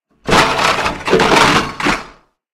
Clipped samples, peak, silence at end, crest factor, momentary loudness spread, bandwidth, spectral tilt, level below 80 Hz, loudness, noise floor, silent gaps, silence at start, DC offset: under 0.1%; 0 dBFS; 0.45 s; 14 dB; 8 LU; 16.5 kHz; -3.5 dB/octave; -36 dBFS; -13 LUFS; -43 dBFS; none; 0.25 s; under 0.1%